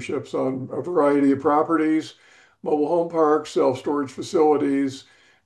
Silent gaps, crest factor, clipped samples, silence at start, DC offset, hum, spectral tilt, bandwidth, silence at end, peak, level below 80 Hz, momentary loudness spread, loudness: none; 14 dB; under 0.1%; 0 s; under 0.1%; none; -6.5 dB/octave; 10 kHz; 0.45 s; -8 dBFS; -68 dBFS; 9 LU; -22 LUFS